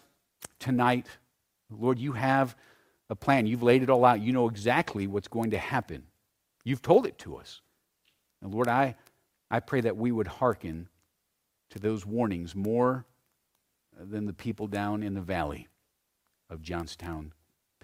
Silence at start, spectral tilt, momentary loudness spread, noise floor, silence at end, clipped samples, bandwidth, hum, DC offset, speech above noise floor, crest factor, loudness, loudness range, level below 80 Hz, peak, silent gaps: 0.4 s; -7 dB/octave; 20 LU; -79 dBFS; 0.55 s; under 0.1%; 16 kHz; none; under 0.1%; 51 dB; 24 dB; -29 LUFS; 9 LU; -58 dBFS; -6 dBFS; none